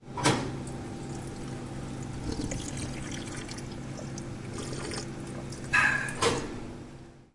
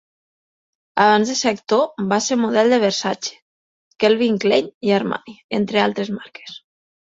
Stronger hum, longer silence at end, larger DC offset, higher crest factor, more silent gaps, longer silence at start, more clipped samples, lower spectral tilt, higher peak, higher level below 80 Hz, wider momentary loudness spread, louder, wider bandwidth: neither; second, 0.1 s vs 0.55 s; neither; about the same, 22 dB vs 18 dB; second, none vs 3.42-3.91 s, 4.74-4.81 s, 5.44-5.49 s; second, 0 s vs 0.95 s; neither; about the same, -4 dB/octave vs -4 dB/octave; second, -10 dBFS vs -2 dBFS; first, -48 dBFS vs -64 dBFS; about the same, 13 LU vs 13 LU; second, -32 LUFS vs -18 LUFS; first, 11.5 kHz vs 8 kHz